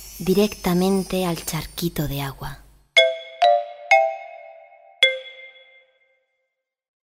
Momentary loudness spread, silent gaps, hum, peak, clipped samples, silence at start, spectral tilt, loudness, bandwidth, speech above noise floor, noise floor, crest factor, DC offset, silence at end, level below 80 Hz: 19 LU; none; none; -2 dBFS; under 0.1%; 0 s; -4.5 dB/octave; -20 LUFS; 16 kHz; 56 dB; -79 dBFS; 22 dB; under 0.1%; 1.7 s; -46 dBFS